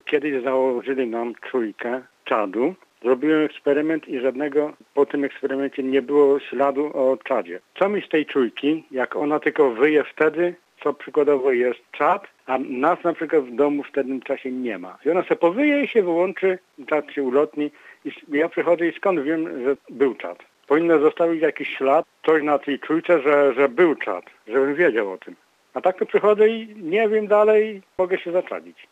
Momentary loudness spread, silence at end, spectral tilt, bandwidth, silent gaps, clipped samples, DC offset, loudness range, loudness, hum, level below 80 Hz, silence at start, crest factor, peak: 10 LU; 0.2 s; -7 dB/octave; 8 kHz; none; under 0.1%; under 0.1%; 3 LU; -21 LUFS; none; -76 dBFS; 0.05 s; 16 dB; -6 dBFS